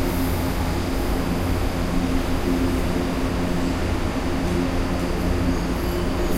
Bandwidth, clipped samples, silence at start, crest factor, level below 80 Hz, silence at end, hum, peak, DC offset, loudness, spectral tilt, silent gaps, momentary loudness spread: 16 kHz; under 0.1%; 0 s; 12 dB; -28 dBFS; 0 s; none; -10 dBFS; under 0.1%; -24 LUFS; -6 dB/octave; none; 2 LU